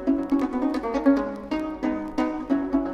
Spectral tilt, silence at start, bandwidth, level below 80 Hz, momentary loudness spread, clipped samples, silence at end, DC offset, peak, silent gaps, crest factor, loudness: -6.5 dB/octave; 0 s; 7.2 kHz; -48 dBFS; 7 LU; under 0.1%; 0 s; under 0.1%; -8 dBFS; none; 16 dB; -25 LUFS